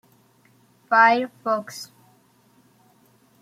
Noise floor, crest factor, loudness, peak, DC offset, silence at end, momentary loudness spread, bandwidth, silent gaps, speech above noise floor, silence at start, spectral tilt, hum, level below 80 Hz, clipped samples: -59 dBFS; 22 dB; -20 LUFS; -4 dBFS; under 0.1%; 1.55 s; 22 LU; 15.5 kHz; none; 39 dB; 0.9 s; -3.5 dB/octave; none; -80 dBFS; under 0.1%